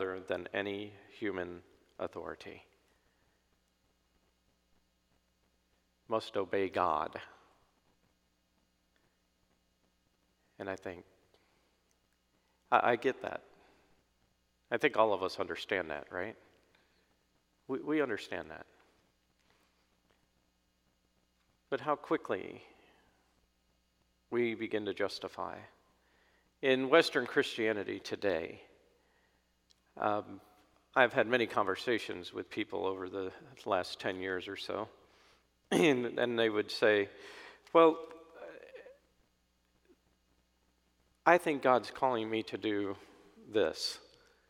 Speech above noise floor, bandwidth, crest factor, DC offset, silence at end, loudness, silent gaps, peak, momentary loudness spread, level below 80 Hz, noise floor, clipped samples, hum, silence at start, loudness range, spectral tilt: 42 dB; 15.5 kHz; 28 dB; under 0.1%; 0.5 s; -34 LUFS; none; -8 dBFS; 20 LU; -74 dBFS; -76 dBFS; under 0.1%; none; 0 s; 14 LU; -4.5 dB/octave